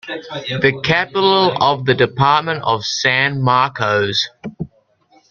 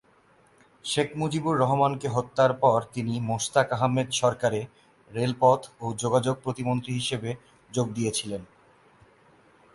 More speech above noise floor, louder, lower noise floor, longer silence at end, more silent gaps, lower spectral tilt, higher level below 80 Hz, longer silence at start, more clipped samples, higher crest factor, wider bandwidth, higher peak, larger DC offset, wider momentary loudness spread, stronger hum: about the same, 38 dB vs 35 dB; first, -15 LUFS vs -26 LUFS; second, -55 dBFS vs -60 dBFS; second, 0.65 s vs 1.3 s; neither; about the same, -4.5 dB/octave vs -5 dB/octave; first, -52 dBFS vs -62 dBFS; second, 0.05 s vs 0.85 s; neither; about the same, 16 dB vs 20 dB; second, 7.2 kHz vs 11.5 kHz; first, -2 dBFS vs -6 dBFS; neither; about the same, 13 LU vs 11 LU; neither